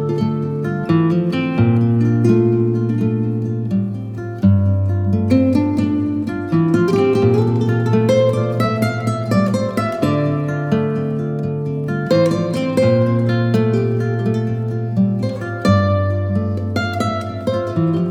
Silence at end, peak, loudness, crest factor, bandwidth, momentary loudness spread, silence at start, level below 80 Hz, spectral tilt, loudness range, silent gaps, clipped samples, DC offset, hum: 0 s; 0 dBFS; -17 LUFS; 16 dB; 12 kHz; 7 LU; 0 s; -50 dBFS; -8.5 dB/octave; 3 LU; none; under 0.1%; under 0.1%; none